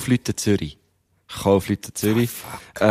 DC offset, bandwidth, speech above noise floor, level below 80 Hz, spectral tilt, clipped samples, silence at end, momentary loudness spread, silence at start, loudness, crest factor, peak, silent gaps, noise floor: under 0.1%; 15.5 kHz; 38 dB; -50 dBFS; -5.5 dB/octave; under 0.1%; 0 s; 14 LU; 0 s; -22 LUFS; 20 dB; -2 dBFS; none; -60 dBFS